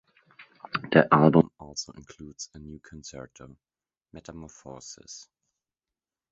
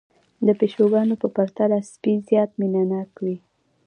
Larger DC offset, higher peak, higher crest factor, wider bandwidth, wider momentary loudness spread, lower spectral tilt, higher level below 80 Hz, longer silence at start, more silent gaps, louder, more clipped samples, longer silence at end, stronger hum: neither; first, -2 dBFS vs -6 dBFS; first, 28 dB vs 16 dB; second, 8 kHz vs 10 kHz; first, 26 LU vs 10 LU; second, -6 dB/octave vs -8.5 dB/octave; first, -58 dBFS vs -72 dBFS; first, 0.75 s vs 0.4 s; neither; about the same, -23 LUFS vs -22 LUFS; neither; first, 1.15 s vs 0.5 s; neither